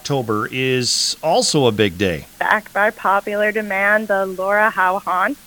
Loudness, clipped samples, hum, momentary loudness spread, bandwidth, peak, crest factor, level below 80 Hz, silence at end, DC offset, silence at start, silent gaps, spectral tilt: -17 LUFS; under 0.1%; none; 5 LU; 19 kHz; 0 dBFS; 18 dB; -52 dBFS; 0.1 s; under 0.1%; 0.05 s; none; -3.5 dB/octave